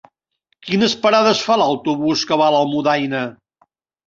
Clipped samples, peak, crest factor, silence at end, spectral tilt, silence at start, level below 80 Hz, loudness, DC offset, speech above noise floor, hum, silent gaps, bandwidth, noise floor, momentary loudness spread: under 0.1%; -2 dBFS; 16 dB; 0.75 s; -4.5 dB/octave; 0.65 s; -60 dBFS; -16 LUFS; under 0.1%; 53 dB; none; none; 7.6 kHz; -69 dBFS; 9 LU